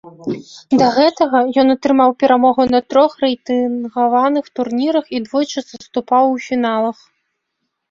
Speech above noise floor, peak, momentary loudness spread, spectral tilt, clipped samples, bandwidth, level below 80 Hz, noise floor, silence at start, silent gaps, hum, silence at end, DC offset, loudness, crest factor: 59 dB; 0 dBFS; 10 LU; -5 dB/octave; under 0.1%; 7.4 kHz; -58 dBFS; -74 dBFS; 0.05 s; none; none; 1 s; under 0.1%; -15 LUFS; 14 dB